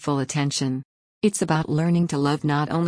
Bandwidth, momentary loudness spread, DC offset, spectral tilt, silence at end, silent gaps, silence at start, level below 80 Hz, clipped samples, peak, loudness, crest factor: 10.5 kHz; 4 LU; under 0.1%; -5.5 dB/octave; 0 s; 0.85-1.21 s; 0 s; -56 dBFS; under 0.1%; -8 dBFS; -23 LUFS; 14 dB